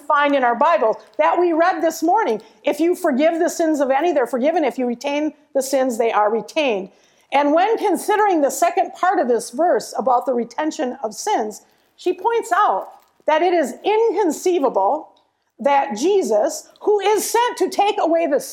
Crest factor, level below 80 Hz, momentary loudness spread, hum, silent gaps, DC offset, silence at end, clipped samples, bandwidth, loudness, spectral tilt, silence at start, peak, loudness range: 16 dB; -74 dBFS; 7 LU; none; none; under 0.1%; 0 s; under 0.1%; 17 kHz; -19 LUFS; -3 dB/octave; 0.1 s; -4 dBFS; 3 LU